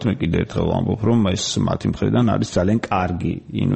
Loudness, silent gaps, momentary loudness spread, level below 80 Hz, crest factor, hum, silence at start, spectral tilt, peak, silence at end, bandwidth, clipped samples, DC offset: -20 LUFS; none; 5 LU; -40 dBFS; 14 dB; none; 0 s; -6 dB/octave; -6 dBFS; 0 s; 8.6 kHz; under 0.1%; 0.3%